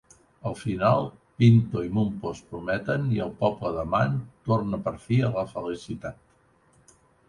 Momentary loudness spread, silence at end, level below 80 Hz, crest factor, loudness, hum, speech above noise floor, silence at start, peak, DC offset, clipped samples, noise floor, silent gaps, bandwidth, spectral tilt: 13 LU; 1.15 s; -52 dBFS; 20 dB; -26 LUFS; none; 37 dB; 0.45 s; -6 dBFS; under 0.1%; under 0.1%; -62 dBFS; none; 10.5 kHz; -8 dB/octave